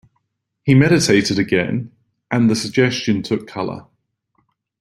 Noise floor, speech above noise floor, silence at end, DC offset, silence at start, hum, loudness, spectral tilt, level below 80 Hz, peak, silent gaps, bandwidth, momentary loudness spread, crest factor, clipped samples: -71 dBFS; 54 dB; 1 s; under 0.1%; 0.65 s; none; -17 LUFS; -5.5 dB/octave; -52 dBFS; -2 dBFS; none; 13 kHz; 13 LU; 18 dB; under 0.1%